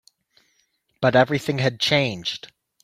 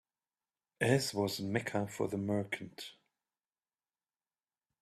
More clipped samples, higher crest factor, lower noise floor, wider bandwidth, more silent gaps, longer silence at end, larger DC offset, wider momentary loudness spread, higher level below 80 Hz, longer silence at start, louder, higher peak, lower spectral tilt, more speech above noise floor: neither; about the same, 20 dB vs 24 dB; second, -68 dBFS vs under -90 dBFS; first, 15.5 kHz vs 14 kHz; neither; second, 0.45 s vs 1.9 s; neither; second, 11 LU vs 14 LU; first, -60 dBFS vs -72 dBFS; first, 1 s vs 0.8 s; first, -21 LUFS vs -35 LUFS; first, -2 dBFS vs -14 dBFS; about the same, -5 dB/octave vs -5 dB/octave; second, 47 dB vs over 55 dB